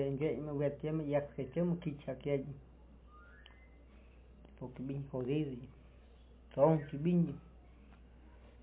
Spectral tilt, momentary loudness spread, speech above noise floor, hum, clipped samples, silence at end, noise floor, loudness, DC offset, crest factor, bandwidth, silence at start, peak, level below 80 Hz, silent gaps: -8.5 dB/octave; 21 LU; 23 dB; none; under 0.1%; 0 s; -59 dBFS; -36 LUFS; under 0.1%; 22 dB; 3.9 kHz; 0 s; -16 dBFS; -60 dBFS; none